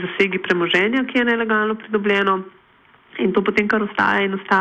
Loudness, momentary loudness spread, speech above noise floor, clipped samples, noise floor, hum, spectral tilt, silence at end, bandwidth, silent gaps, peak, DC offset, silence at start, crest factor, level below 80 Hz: -19 LUFS; 4 LU; 34 dB; under 0.1%; -53 dBFS; none; -6 dB/octave; 0 s; 8.6 kHz; none; -4 dBFS; under 0.1%; 0 s; 14 dB; -58 dBFS